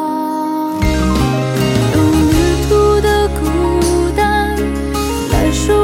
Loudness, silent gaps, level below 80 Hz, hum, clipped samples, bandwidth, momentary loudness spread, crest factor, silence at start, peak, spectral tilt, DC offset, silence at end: -14 LUFS; none; -22 dBFS; none; under 0.1%; 17 kHz; 6 LU; 12 dB; 0 s; 0 dBFS; -5.5 dB/octave; under 0.1%; 0 s